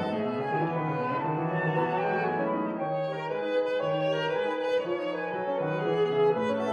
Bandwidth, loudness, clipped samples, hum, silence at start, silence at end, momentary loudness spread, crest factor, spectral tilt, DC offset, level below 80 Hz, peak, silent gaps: 9.4 kHz; -29 LUFS; under 0.1%; none; 0 s; 0 s; 5 LU; 12 dB; -7.5 dB/octave; under 0.1%; -78 dBFS; -16 dBFS; none